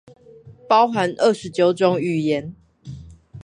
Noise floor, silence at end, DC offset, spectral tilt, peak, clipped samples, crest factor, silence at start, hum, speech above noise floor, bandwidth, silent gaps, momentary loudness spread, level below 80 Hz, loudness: -45 dBFS; 0 s; under 0.1%; -6 dB/octave; -2 dBFS; under 0.1%; 18 dB; 0.45 s; none; 27 dB; 11 kHz; none; 22 LU; -54 dBFS; -19 LUFS